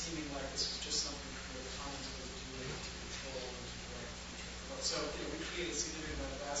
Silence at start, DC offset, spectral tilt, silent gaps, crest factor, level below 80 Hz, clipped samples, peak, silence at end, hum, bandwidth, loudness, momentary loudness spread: 0 s; under 0.1%; -2.5 dB/octave; none; 18 dB; -52 dBFS; under 0.1%; -24 dBFS; 0 s; none; 8.2 kHz; -41 LUFS; 9 LU